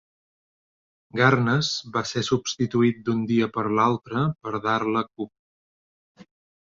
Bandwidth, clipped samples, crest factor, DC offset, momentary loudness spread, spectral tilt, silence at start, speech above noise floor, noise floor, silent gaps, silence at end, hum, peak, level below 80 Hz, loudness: 7.8 kHz; under 0.1%; 22 dB; under 0.1%; 8 LU; -5.5 dB/octave; 1.15 s; over 67 dB; under -90 dBFS; 5.39-6.15 s; 0.45 s; none; -4 dBFS; -60 dBFS; -24 LUFS